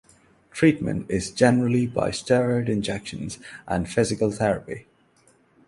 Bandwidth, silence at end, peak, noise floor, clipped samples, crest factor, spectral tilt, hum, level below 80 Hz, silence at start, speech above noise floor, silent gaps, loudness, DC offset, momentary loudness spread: 11.5 kHz; 0.85 s; -2 dBFS; -60 dBFS; under 0.1%; 22 dB; -6 dB/octave; none; -50 dBFS; 0.55 s; 37 dB; none; -23 LUFS; under 0.1%; 14 LU